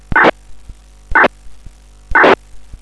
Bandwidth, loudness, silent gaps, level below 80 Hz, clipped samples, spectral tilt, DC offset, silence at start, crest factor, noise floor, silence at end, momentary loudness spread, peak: 11 kHz; -12 LUFS; none; -32 dBFS; under 0.1%; -5 dB/octave; under 0.1%; 0.1 s; 14 dB; -37 dBFS; 0.15 s; 6 LU; 0 dBFS